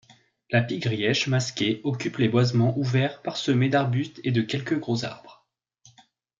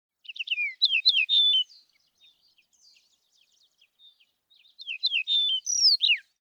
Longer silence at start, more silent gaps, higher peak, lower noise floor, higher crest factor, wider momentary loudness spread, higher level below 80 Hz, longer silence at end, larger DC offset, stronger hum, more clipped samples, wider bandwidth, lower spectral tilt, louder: first, 0.5 s vs 0.3 s; neither; about the same, -6 dBFS vs -8 dBFS; second, -60 dBFS vs -67 dBFS; about the same, 18 dB vs 20 dB; second, 7 LU vs 17 LU; first, -66 dBFS vs under -90 dBFS; first, 1.05 s vs 0.2 s; neither; neither; neither; second, 7.6 kHz vs 16.5 kHz; first, -6 dB/octave vs 9.5 dB/octave; second, -25 LUFS vs -22 LUFS